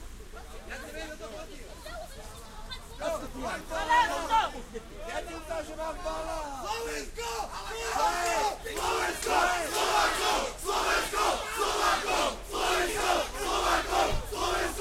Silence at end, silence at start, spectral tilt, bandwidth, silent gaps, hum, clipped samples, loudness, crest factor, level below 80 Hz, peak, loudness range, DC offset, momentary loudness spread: 0 s; 0 s; -2 dB/octave; 16.5 kHz; none; none; under 0.1%; -29 LUFS; 18 dB; -44 dBFS; -12 dBFS; 8 LU; under 0.1%; 16 LU